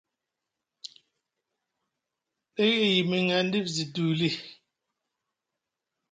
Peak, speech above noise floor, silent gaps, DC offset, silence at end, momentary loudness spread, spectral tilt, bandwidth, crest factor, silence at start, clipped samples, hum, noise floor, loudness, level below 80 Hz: -10 dBFS; 61 dB; none; under 0.1%; 1.6 s; 22 LU; -5 dB/octave; 9.2 kHz; 20 dB; 2.55 s; under 0.1%; none; -86 dBFS; -26 LUFS; -74 dBFS